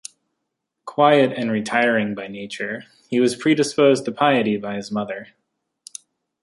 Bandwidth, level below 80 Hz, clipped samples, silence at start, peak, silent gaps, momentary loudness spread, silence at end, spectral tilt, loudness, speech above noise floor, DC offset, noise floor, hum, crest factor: 11.5 kHz; -66 dBFS; under 0.1%; 0.85 s; -2 dBFS; none; 22 LU; 1.2 s; -5 dB/octave; -20 LUFS; 59 dB; under 0.1%; -79 dBFS; none; 20 dB